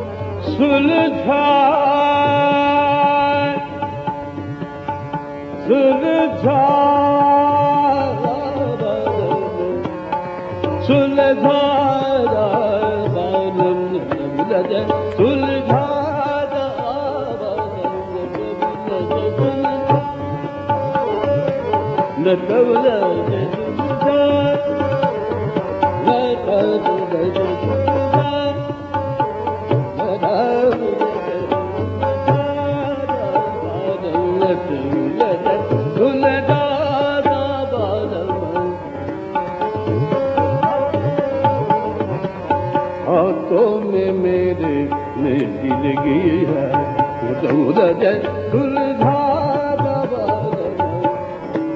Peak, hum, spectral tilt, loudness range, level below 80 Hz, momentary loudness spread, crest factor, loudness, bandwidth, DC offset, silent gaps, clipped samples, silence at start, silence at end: 0 dBFS; none; -5.5 dB/octave; 5 LU; -50 dBFS; 9 LU; 16 dB; -18 LUFS; 7 kHz; under 0.1%; none; under 0.1%; 0 s; 0 s